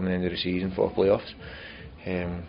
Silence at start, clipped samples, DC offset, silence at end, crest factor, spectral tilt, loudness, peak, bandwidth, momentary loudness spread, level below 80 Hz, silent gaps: 0 s; under 0.1%; under 0.1%; 0 s; 18 dB; -5 dB/octave; -27 LUFS; -10 dBFS; 5.4 kHz; 17 LU; -48 dBFS; none